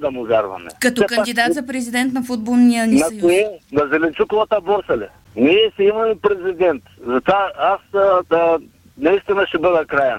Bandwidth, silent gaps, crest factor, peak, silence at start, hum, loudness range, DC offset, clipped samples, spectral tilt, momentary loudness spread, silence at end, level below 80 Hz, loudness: 16.5 kHz; none; 14 dB; -2 dBFS; 0 s; none; 1 LU; under 0.1%; under 0.1%; -4.5 dB/octave; 7 LU; 0 s; -50 dBFS; -17 LUFS